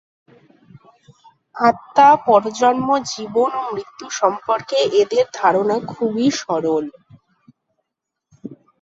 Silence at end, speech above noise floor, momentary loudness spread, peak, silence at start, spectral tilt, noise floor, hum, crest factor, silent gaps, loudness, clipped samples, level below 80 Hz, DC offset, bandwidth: 0.25 s; 63 dB; 16 LU; -2 dBFS; 1.55 s; -4 dB/octave; -80 dBFS; none; 18 dB; none; -17 LUFS; under 0.1%; -64 dBFS; under 0.1%; 7.8 kHz